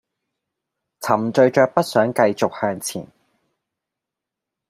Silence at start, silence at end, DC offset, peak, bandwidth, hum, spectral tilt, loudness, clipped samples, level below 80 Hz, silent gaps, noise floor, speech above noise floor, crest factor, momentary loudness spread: 1 s; 1.65 s; under 0.1%; 0 dBFS; 15.5 kHz; none; -5 dB/octave; -19 LUFS; under 0.1%; -66 dBFS; none; -85 dBFS; 67 dB; 22 dB; 13 LU